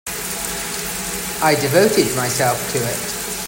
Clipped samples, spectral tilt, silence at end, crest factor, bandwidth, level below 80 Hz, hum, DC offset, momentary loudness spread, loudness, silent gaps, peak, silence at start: under 0.1%; -3 dB/octave; 0 s; 18 dB; 16.5 kHz; -44 dBFS; none; under 0.1%; 8 LU; -18 LUFS; none; -2 dBFS; 0.05 s